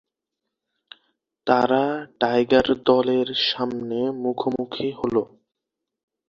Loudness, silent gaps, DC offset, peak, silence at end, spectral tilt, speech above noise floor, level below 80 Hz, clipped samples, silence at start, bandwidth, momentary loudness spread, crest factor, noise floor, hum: -22 LUFS; none; under 0.1%; -2 dBFS; 1.05 s; -6 dB/octave; 62 dB; -58 dBFS; under 0.1%; 1.45 s; 7.2 kHz; 8 LU; 22 dB; -84 dBFS; none